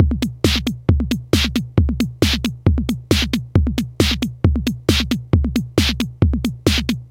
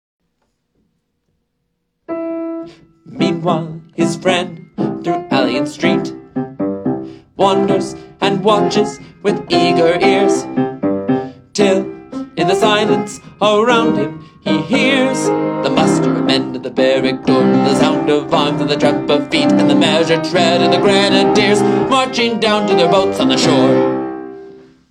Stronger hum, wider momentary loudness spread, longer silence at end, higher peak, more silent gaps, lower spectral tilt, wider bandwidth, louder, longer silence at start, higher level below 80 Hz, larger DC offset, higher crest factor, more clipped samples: neither; second, 2 LU vs 12 LU; second, 0 s vs 0.3 s; about the same, 0 dBFS vs 0 dBFS; neither; about the same, -5.5 dB/octave vs -5 dB/octave; first, 16.5 kHz vs 12.5 kHz; second, -19 LUFS vs -14 LUFS; second, 0 s vs 2.1 s; first, -24 dBFS vs -54 dBFS; neither; about the same, 18 dB vs 14 dB; neither